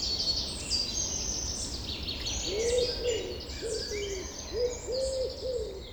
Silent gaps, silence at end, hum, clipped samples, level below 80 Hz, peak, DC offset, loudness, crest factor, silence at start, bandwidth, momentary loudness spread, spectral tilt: none; 0 s; none; under 0.1%; -44 dBFS; -16 dBFS; under 0.1%; -31 LUFS; 16 dB; 0 s; over 20 kHz; 7 LU; -2.5 dB/octave